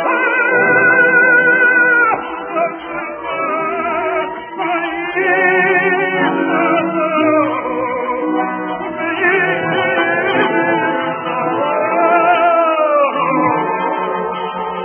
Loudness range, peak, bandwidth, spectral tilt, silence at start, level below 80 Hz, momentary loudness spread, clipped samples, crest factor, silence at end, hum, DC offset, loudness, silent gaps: 4 LU; 0 dBFS; 3.4 kHz; -8.5 dB/octave; 0 s; -58 dBFS; 11 LU; under 0.1%; 14 dB; 0 s; none; under 0.1%; -14 LUFS; none